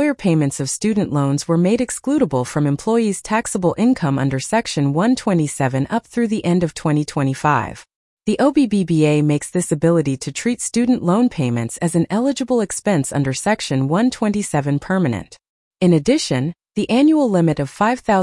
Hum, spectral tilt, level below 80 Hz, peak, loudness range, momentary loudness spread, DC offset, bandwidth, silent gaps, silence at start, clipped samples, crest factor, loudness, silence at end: none; -6 dB/octave; -50 dBFS; -4 dBFS; 1 LU; 5 LU; under 0.1%; 12 kHz; 7.95-8.17 s, 15.49-15.71 s; 0 s; under 0.1%; 14 dB; -18 LUFS; 0 s